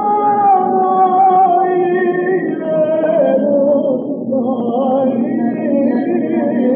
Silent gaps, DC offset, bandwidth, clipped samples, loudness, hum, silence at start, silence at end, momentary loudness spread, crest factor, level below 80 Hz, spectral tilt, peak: none; under 0.1%; 3.6 kHz; under 0.1%; -14 LUFS; none; 0 s; 0 s; 6 LU; 10 dB; -78 dBFS; -7 dB/octave; -2 dBFS